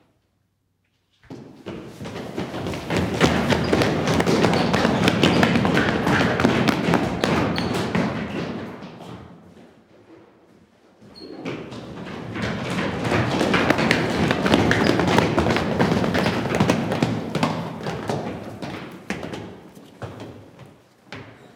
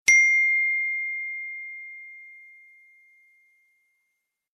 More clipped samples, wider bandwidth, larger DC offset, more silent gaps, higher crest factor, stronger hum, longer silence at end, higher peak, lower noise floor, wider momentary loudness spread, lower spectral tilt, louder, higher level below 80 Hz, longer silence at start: neither; first, 18 kHz vs 13.5 kHz; neither; neither; about the same, 22 dB vs 24 dB; neither; second, 0.1 s vs 2.15 s; about the same, 0 dBFS vs -2 dBFS; second, -69 dBFS vs -79 dBFS; second, 19 LU vs 25 LU; first, -5.5 dB/octave vs 3.5 dB/octave; about the same, -21 LUFS vs -21 LUFS; first, -48 dBFS vs -74 dBFS; first, 1.3 s vs 0.05 s